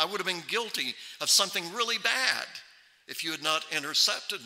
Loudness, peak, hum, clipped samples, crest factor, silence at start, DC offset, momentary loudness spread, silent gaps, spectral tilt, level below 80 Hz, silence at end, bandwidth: -27 LUFS; -8 dBFS; none; under 0.1%; 24 dB; 0 s; under 0.1%; 11 LU; none; 0 dB/octave; -84 dBFS; 0 s; 16 kHz